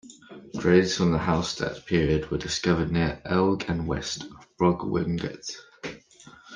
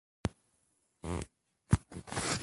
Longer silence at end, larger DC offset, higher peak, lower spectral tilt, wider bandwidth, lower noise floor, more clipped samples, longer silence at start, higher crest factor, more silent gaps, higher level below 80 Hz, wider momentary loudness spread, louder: about the same, 0 s vs 0 s; neither; first, -6 dBFS vs -12 dBFS; about the same, -5.5 dB/octave vs -4.5 dB/octave; second, 9.8 kHz vs 11.5 kHz; second, -51 dBFS vs -76 dBFS; neither; second, 0.05 s vs 0.25 s; second, 20 dB vs 26 dB; neither; about the same, -46 dBFS vs -48 dBFS; first, 17 LU vs 11 LU; first, -25 LUFS vs -37 LUFS